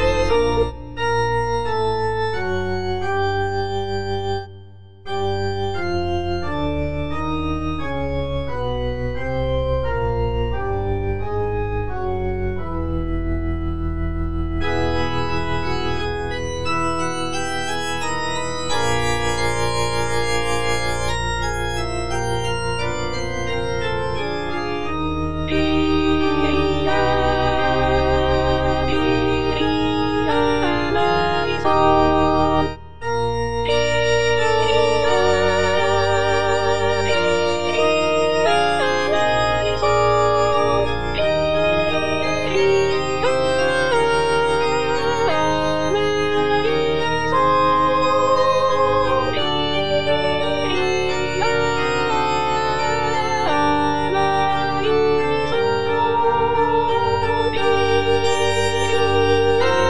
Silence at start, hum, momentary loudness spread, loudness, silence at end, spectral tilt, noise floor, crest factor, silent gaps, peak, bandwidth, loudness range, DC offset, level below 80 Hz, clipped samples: 0 s; none; 8 LU; -20 LUFS; 0 s; -5 dB/octave; -42 dBFS; 14 dB; none; -4 dBFS; 10.5 kHz; 6 LU; 4%; -32 dBFS; under 0.1%